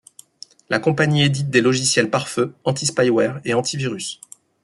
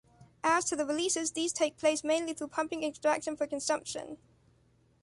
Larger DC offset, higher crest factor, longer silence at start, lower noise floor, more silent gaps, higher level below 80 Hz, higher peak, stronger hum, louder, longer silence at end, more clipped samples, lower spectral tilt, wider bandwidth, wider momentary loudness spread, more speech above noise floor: neither; about the same, 18 dB vs 18 dB; first, 0.7 s vs 0.2 s; second, -46 dBFS vs -67 dBFS; neither; first, -60 dBFS vs -70 dBFS; first, -2 dBFS vs -14 dBFS; neither; first, -19 LUFS vs -31 LUFS; second, 0.5 s vs 0.85 s; neither; first, -4.5 dB/octave vs -2 dB/octave; about the same, 12 kHz vs 11.5 kHz; about the same, 8 LU vs 7 LU; second, 27 dB vs 35 dB